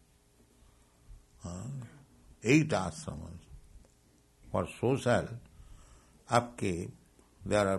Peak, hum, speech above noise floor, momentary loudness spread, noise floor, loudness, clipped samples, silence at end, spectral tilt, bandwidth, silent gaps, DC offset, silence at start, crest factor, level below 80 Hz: -10 dBFS; none; 35 dB; 21 LU; -65 dBFS; -32 LUFS; under 0.1%; 0 s; -6 dB/octave; 12 kHz; none; under 0.1%; 1.1 s; 26 dB; -56 dBFS